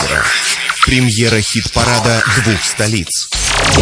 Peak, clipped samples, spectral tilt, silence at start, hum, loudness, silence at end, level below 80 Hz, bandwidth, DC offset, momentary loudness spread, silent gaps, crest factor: 0 dBFS; under 0.1%; -3 dB/octave; 0 s; none; -12 LUFS; 0 s; -28 dBFS; 10.5 kHz; under 0.1%; 3 LU; none; 12 dB